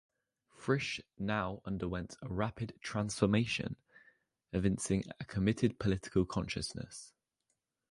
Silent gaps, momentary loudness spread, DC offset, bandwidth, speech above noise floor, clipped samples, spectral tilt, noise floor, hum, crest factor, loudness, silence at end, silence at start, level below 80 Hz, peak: none; 11 LU; under 0.1%; 11.5 kHz; 49 dB; under 0.1%; -5.5 dB/octave; -84 dBFS; none; 22 dB; -36 LUFS; 0.8 s; 0.6 s; -54 dBFS; -14 dBFS